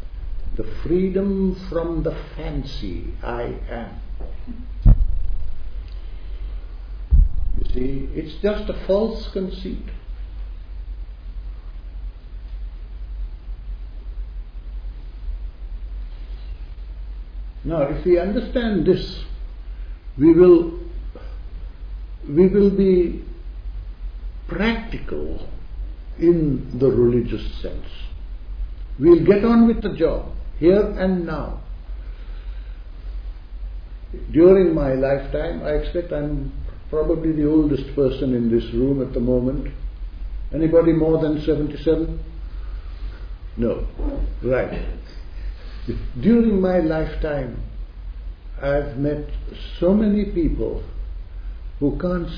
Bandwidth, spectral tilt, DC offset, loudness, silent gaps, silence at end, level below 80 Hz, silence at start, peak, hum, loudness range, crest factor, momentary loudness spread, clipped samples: 5.4 kHz; -10 dB/octave; under 0.1%; -20 LUFS; none; 0 s; -28 dBFS; 0 s; 0 dBFS; none; 17 LU; 20 dB; 20 LU; under 0.1%